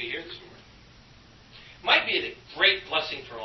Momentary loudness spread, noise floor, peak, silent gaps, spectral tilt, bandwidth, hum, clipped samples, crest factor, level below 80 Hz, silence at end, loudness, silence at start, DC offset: 15 LU; -53 dBFS; -6 dBFS; none; -3 dB/octave; 6.2 kHz; none; under 0.1%; 22 dB; -60 dBFS; 0 s; -24 LUFS; 0 s; under 0.1%